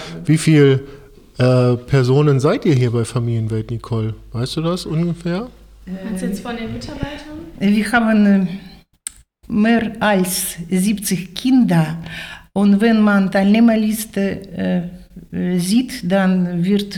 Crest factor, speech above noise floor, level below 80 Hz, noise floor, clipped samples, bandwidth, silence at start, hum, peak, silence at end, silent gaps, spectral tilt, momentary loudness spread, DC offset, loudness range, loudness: 16 dB; 19 dB; -44 dBFS; -36 dBFS; under 0.1%; 17.5 kHz; 0 s; none; -2 dBFS; 0 s; none; -6 dB/octave; 15 LU; under 0.1%; 7 LU; -17 LUFS